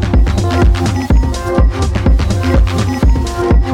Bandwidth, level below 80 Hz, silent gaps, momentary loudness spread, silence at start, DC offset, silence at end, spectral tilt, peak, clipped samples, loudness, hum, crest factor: 11.5 kHz; -14 dBFS; none; 2 LU; 0 s; under 0.1%; 0 s; -6.5 dB/octave; 0 dBFS; under 0.1%; -13 LUFS; none; 10 dB